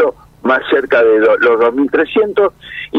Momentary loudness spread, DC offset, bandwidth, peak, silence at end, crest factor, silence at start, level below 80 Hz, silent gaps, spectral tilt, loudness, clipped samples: 7 LU; under 0.1%; 5.4 kHz; 0 dBFS; 0 s; 12 dB; 0 s; -50 dBFS; none; -6 dB/octave; -12 LUFS; under 0.1%